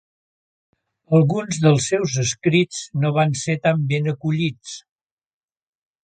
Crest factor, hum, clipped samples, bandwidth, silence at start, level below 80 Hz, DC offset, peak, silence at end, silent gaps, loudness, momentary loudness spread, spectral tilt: 18 dB; none; under 0.1%; 9.2 kHz; 1.1 s; -58 dBFS; under 0.1%; -2 dBFS; 1.25 s; none; -20 LUFS; 7 LU; -5.5 dB/octave